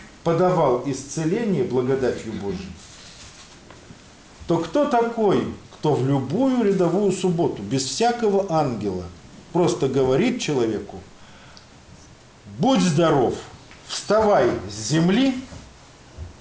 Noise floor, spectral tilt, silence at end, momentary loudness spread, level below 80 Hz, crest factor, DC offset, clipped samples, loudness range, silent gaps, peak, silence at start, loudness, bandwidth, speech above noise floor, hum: -47 dBFS; -6 dB/octave; 0.1 s; 21 LU; -50 dBFS; 14 dB; under 0.1%; under 0.1%; 5 LU; none; -8 dBFS; 0 s; -21 LUFS; 10 kHz; 27 dB; none